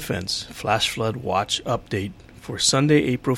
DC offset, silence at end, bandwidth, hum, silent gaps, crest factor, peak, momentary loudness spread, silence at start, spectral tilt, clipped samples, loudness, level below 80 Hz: under 0.1%; 0 s; 16.5 kHz; none; none; 18 dB; -4 dBFS; 11 LU; 0 s; -4 dB/octave; under 0.1%; -22 LUFS; -48 dBFS